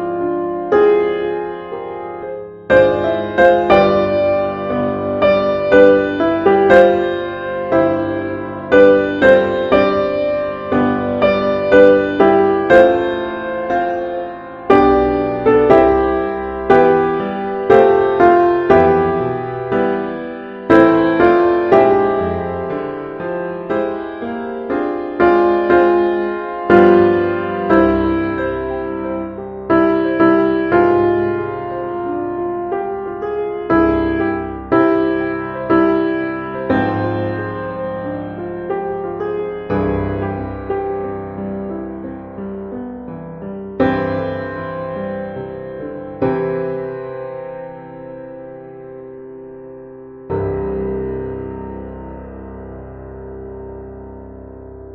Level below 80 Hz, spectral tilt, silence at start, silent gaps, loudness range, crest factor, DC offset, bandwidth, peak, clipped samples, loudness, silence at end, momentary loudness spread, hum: -40 dBFS; -5.5 dB/octave; 0 s; none; 12 LU; 16 dB; under 0.1%; 5.8 kHz; 0 dBFS; under 0.1%; -15 LUFS; 0 s; 19 LU; none